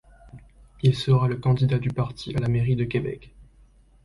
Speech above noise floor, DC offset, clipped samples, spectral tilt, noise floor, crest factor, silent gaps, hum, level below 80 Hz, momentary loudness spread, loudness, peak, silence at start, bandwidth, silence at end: 32 dB; under 0.1%; under 0.1%; -8 dB/octave; -55 dBFS; 18 dB; none; none; -46 dBFS; 8 LU; -24 LUFS; -8 dBFS; 0.25 s; 11.5 kHz; 0.6 s